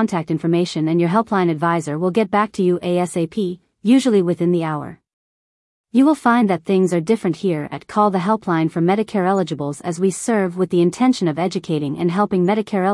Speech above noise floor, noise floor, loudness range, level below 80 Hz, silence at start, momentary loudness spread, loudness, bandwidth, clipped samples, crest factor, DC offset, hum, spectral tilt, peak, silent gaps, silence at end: over 72 dB; under -90 dBFS; 1 LU; -62 dBFS; 0 s; 7 LU; -18 LUFS; 12 kHz; under 0.1%; 14 dB; under 0.1%; none; -6.5 dB/octave; -4 dBFS; 5.13-5.84 s; 0 s